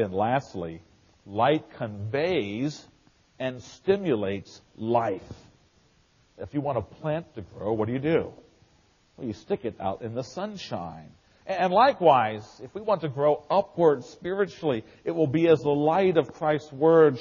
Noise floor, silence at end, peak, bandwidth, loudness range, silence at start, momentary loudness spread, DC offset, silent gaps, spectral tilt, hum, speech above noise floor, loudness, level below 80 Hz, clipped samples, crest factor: -63 dBFS; 0 s; -6 dBFS; 7.2 kHz; 8 LU; 0 s; 16 LU; under 0.1%; none; -5.5 dB/octave; none; 37 dB; -26 LUFS; -62 dBFS; under 0.1%; 20 dB